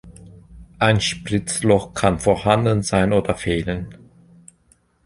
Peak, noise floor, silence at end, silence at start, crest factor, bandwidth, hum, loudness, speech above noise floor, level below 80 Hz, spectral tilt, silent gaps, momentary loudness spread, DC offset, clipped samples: -2 dBFS; -59 dBFS; 1.1 s; 0.05 s; 18 dB; 11.5 kHz; none; -19 LUFS; 40 dB; -40 dBFS; -5 dB/octave; none; 6 LU; under 0.1%; under 0.1%